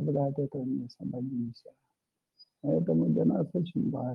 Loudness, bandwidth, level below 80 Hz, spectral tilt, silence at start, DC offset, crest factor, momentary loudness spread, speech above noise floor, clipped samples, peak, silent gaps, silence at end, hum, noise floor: -31 LUFS; 5.8 kHz; -72 dBFS; -11.5 dB/octave; 0 s; under 0.1%; 14 dB; 10 LU; 54 dB; under 0.1%; -16 dBFS; none; 0 s; none; -84 dBFS